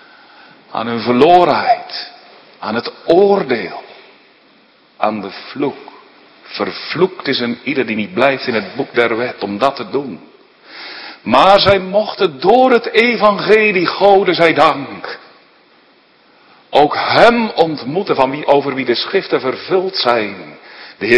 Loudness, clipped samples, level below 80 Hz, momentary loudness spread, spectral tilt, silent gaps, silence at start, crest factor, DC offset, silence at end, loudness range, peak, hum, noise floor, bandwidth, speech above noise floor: -14 LUFS; 0.3%; -52 dBFS; 18 LU; -6 dB/octave; none; 0.7 s; 14 dB; under 0.1%; 0 s; 8 LU; 0 dBFS; none; -50 dBFS; 11 kHz; 36 dB